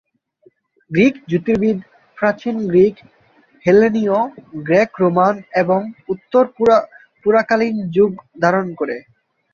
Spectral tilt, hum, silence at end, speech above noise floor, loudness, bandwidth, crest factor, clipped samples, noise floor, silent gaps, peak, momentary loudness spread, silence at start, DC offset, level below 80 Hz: -7.5 dB/octave; none; 0.55 s; 39 dB; -17 LUFS; 7.2 kHz; 16 dB; under 0.1%; -55 dBFS; none; -2 dBFS; 11 LU; 0.9 s; under 0.1%; -56 dBFS